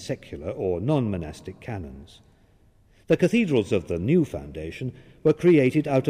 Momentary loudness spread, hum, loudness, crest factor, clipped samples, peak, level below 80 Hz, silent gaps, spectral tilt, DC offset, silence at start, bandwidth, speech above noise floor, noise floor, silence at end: 17 LU; none; -24 LUFS; 16 dB; under 0.1%; -8 dBFS; -50 dBFS; none; -7.5 dB/octave; under 0.1%; 0 s; 12.5 kHz; 34 dB; -58 dBFS; 0 s